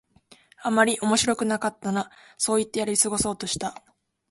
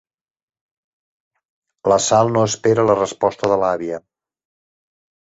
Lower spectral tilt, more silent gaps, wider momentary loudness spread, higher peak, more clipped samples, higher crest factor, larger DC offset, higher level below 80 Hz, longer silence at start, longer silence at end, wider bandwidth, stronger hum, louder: second, -3 dB/octave vs -4.5 dB/octave; neither; about the same, 9 LU vs 10 LU; second, -6 dBFS vs -2 dBFS; neither; about the same, 20 dB vs 18 dB; neither; about the same, -56 dBFS vs -56 dBFS; second, 0.6 s vs 1.85 s; second, 0.55 s vs 1.2 s; first, 12 kHz vs 8.2 kHz; neither; second, -24 LUFS vs -17 LUFS